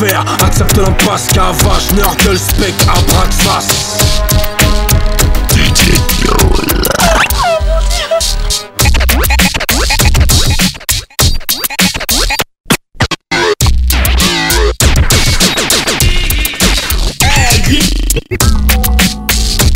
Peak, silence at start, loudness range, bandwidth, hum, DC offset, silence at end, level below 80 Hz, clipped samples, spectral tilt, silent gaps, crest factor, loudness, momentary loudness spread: 0 dBFS; 0 s; 1 LU; 17 kHz; none; under 0.1%; 0 s; -14 dBFS; 0.2%; -3.5 dB/octave; 12.60-12.64 s; 10 dB; -10 LUFS; 4 LU